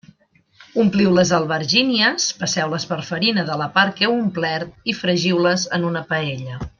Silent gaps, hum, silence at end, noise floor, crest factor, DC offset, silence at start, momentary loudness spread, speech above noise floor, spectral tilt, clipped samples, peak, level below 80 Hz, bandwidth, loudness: none; none; 0.1 s; -58 dBFS; 18 dB; under 0.1%; 0.6 s; 9 LU; 39 dB; -4 dB/octave; under 0.1%; -2 dBFS; -52 dBFS; 7.4 kHz; -19 LUFS